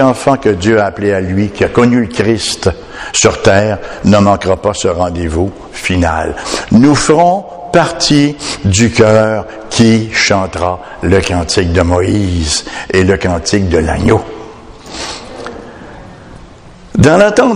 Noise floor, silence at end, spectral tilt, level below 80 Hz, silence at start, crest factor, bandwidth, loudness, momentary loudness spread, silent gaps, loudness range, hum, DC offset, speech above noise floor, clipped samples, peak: -35 dBFS; 0 s; -5 dB/octave; -30 dBFS; 0 s; 12 dB; 12 kHz; -11 LUFS; 13 LU; none; 4 LU; none; under 0.1%; 24 dB; 0.6%; 0 dBFS